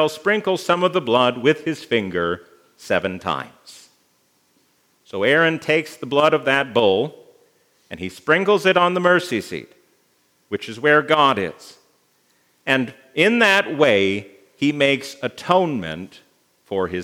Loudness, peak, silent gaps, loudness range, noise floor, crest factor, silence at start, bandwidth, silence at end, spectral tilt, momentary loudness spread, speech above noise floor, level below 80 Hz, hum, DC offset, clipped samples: -19 LUFS; 0 dBFS; none; 5 LU; -63 dBFS; 20 dB; 0 s; 16 kHz; 0 s; -5 dB/octave; 14 LU; 43 dB; -66 dBFS; none; under 0.1%; under 0.1%